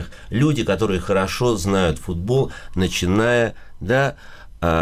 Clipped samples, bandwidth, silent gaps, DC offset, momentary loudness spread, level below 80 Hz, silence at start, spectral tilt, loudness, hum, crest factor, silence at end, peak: under 0.1%; 15.5 kHz; none; under 0.1%; 7 LU; -36 dBFS; 0 s; -5.5 dB/octave; -20 LUFS; none; 12 dB; 0 s; -8 dBFS